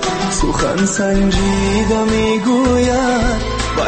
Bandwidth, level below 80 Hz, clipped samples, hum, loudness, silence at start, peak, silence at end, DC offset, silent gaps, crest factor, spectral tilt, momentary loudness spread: 8.8 kHz; -24 dBFS; under 0.1%; none; -15 LUFS; 0 s; -4 dBFS; 0 s; under 0.1%; none; 12 dB; -4.5 dB/octave; 4 LU